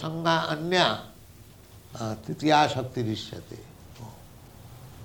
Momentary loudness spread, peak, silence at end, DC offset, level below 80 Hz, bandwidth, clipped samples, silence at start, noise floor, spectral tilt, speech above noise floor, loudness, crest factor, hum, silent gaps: 25 LU; -6 dBFS; 0 s; under 0.1%; -58 dBFS; 19.5 kHz; under 0.1%; 0 s; -50 dBFS; -5 dB/octave; 24 dB; -26 LUFS; 24 dB; none; none